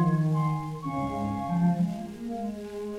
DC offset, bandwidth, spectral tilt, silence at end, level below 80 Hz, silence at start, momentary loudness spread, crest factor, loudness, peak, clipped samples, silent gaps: under 0.1%; 11.5 kHz; -9 dB/octave; 0 s; -54 dBFS; 0 s; 10 LU; 14 dB; -29 LUFS; -14 dBFS; under 0.1%; none